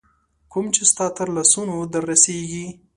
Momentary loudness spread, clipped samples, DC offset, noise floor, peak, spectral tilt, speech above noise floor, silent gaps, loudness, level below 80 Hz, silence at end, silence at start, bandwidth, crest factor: 14 LU; under 0.1%; under 0.1%; -58 dBFS; 0 dBFS; -2.5 dB/octave; 38 dB; none; -17 LUFS; -58 dBFS; 0.25 s; 0.5 s; 11.5 kHz; 22 dB